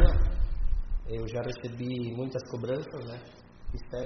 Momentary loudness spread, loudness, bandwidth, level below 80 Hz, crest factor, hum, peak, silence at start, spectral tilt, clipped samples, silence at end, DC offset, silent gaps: 11 LU; -35 LUFS; 6.4 kHz; -30 dBFS; 22 dB; none; -6 dBFS; 0 s; -7 dB/octave; under 0.1%; 0 s; under 0.1%; none